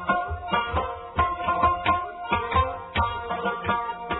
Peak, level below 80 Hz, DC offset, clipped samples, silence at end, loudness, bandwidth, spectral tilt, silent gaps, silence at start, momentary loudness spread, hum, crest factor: -8 dBFS; -40 dBFS; under 0.1%; under 0.1%; 0 s; -26 LUFS; 4.1 kHz; -9 dB/octave; none; 0 s; 5 LU; none; 18 dB